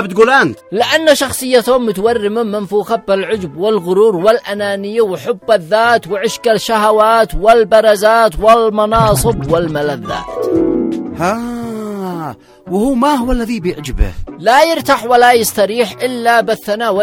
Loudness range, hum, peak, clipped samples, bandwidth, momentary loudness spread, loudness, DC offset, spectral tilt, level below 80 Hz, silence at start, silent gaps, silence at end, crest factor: 7 LU; none; 0 dBFS; 0.2%; 17 kHz; 10 LU; -13 LUFS; under 0.1%; -4.5 dB/octave; -30 dBFS; 0 s; none; 0 s; 12 dB